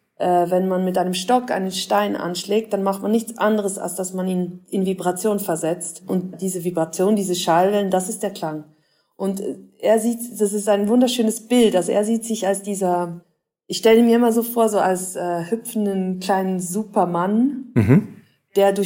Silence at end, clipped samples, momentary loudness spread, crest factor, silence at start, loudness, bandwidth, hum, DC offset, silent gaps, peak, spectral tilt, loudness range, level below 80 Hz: 0 s; under 0.1%; 9 LU; 18 dB; 0.2 s; -20 LUFS; 16.5 kHz; none; under 0.1%; none; -2 dBFS; -5.5 dB/octave; 4 LU; -64 dBFS